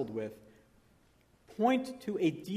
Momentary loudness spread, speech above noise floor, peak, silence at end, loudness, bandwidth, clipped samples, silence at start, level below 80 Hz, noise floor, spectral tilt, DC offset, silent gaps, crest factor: 13 LU; 34 dB; -16 dBFS; 0 s; -33 LUFS; 15 kHz; under 0.1%; 0 s; -72 dBFS; -67 dBFS; -6.5 dB/octave; under 0.1%; none; 20 dB